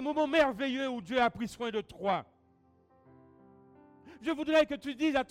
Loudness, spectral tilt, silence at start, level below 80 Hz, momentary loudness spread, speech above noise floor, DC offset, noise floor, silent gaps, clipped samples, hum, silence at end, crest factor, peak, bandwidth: -31 LUFS; -5 dB/octave; 0 s; -64 dBFS; 9 LU; 36 dB; under 0.1%; -66 dBFS; none; under 0.1%; none; 0.05 s; 18 dB; -16 dBFS; 14.5 kHz